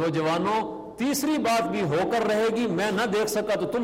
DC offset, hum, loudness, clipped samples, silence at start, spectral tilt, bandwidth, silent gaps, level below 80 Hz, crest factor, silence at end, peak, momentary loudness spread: under 0.1%; none; -25 LUFS; under 0.1%; 0 s; -4.5 dB/octave; 16 kHz; none; -60 dBFS; 10 dB; 0 s; -14 dBFS; 3 LU